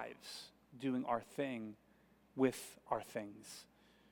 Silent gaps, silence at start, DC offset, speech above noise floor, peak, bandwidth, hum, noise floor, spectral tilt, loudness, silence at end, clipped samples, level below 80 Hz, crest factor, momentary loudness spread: none; 0 s; under 0.1%; 28 dB; -20 dBFS; 18 kHz; none; -70 dBFS; -5 dB/octave; -42 LUFS; 0.5 s; under 0.1%; -78 dBFS; 22 dB; 16 LU